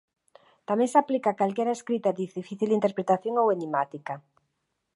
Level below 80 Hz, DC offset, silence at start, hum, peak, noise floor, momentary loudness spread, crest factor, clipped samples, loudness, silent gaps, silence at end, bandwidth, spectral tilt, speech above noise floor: -80 dBFS; under 0.1%; 0.7 s; none; -8 dBFS; -79 dBFS; 12 LU; 20 dB; under 0.1%; -26 LUFS; none; 0.75 s; 11.5 kHz; -6.5 dB/octave; 53 dB